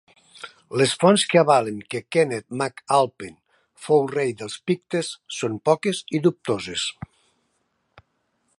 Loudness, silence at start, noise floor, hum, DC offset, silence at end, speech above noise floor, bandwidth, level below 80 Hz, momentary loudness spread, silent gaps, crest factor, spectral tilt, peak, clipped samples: -22 LUFS; 0.4 s; -71 dBFS; none; under 0.1%; 1.7 s; 49 dB; 11.5 kHz; -64 dBFS; 22 LU; none; 22 dB; -4.5 dB/octave; -2 dBFS; under 0.1%